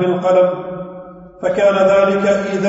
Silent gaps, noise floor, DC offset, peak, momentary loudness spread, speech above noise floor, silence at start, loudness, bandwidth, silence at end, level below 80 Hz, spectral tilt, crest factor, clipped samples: none; -35 dBFS; under 0.1%; -2 dBFS; 17 LU; 21 dB; 0 s; -14 LUFS; 8 kHz; 0 s; -52 dBFS; -6.5 dB/octave; 12 dB; under 0.1%